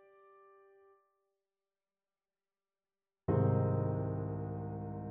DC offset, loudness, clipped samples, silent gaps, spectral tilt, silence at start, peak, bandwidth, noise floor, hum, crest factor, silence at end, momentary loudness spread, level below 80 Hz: under 0.1%; -36 LUFS; under 0.1%; none; -12 dB/octave; 3.3 s; -20 dBFS; 3.1 kHz; under -90 dBFS; none; 18 dB; 0 s; 11 LU; -60 dBFS